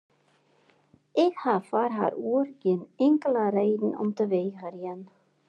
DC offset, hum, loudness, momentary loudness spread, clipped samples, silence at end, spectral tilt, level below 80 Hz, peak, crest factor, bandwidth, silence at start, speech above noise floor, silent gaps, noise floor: under 0.1%; none; -27 LUFS; 12 LU; under 0.1%; 0.45 s; -8 dB/octave; -86 dBFS; -10 dBFS; 18 dB; 9.2 kHz; 1.15 s; 40 dB; none; -66 dBFS